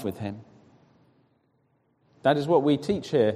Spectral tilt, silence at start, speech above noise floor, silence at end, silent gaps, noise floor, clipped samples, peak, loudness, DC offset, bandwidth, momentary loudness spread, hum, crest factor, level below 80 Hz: -7 dB/octave; 0 s; 45 dB; 0 s; none; -69 dBFS; under 0.1%; -8 dBFS; -25 LUFS; under 0.1%; 14 kHz; 14 LU; none; 20 dB; -62 dBFS